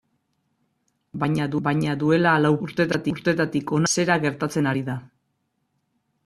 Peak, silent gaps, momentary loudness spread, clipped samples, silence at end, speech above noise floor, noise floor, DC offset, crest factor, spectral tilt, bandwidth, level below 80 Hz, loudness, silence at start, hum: -4 dBFS; none; 9 LU; under 0.1%; 1.2 s; 52 dB; -73 dBFS; under 0.1%; 20 dB; -5.5 dB/octave; 13 kHz; -60 dBFS; -22 LUFS; 1.15 s; none